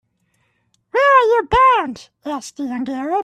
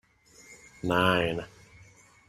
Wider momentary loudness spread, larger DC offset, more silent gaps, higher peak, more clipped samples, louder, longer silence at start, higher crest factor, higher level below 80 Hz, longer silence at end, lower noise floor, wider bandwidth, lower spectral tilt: second, 16 LU vs 25 LU; neither; neither; first, -2 dBFS vs -8 dBFS; neither; first, -16 LUFS vs -27 LUFS; first, 0.95 s vs 0.5 s; second, 16 dB vs 24 dB; first, -42 dBFS vs -56 dBFS; second, 0 s vs 0.8 s; first, -65 dBFS vs -56 dBFS; second, 12.5 kHz vs 15.5 kHz; about the same, -4.5 dB/octave vs -5.5 dB/octave